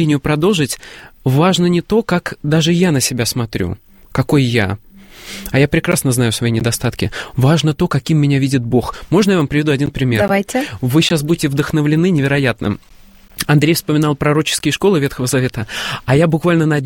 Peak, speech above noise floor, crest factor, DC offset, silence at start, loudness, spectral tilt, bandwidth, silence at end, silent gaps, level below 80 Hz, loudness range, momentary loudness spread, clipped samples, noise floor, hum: 0 dBFS; 19 dB; 14 dB; under 0.1%; 0 s; -15 LUFS; -5.5 dB/octave; 17 kHz; 0 s; none; -40 dBFS; 2 LU; 8 LU; under 0.1%; -34 dBFS; none